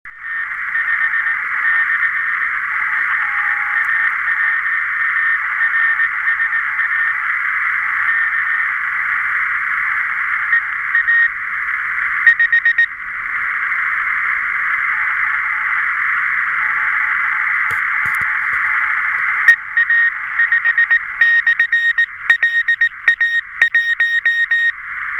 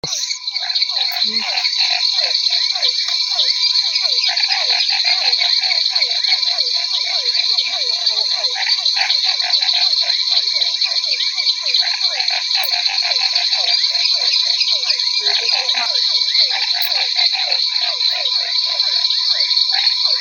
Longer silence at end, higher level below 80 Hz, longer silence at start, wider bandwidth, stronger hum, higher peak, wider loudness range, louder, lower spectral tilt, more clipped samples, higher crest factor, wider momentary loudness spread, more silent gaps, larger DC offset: about the same, 0 s vs 0 s; first, -56 dBFS vs -72 dBFS; about the same, 0.05 s vs 0.05 s; about the same, 17 kHz vs 17 kHz; neither; about the same, 0 dBFS vs 0 dBFS; about the same, 3 LU vs 1 LU; about the same, -15 LUFS vs -14 LUFS; first, -0.5 dB/octave vs 2.5 dB/octave; neither; about the same, 16 dB vs 16 dB; about the same, 5 LU vs 3 LU; neither; neither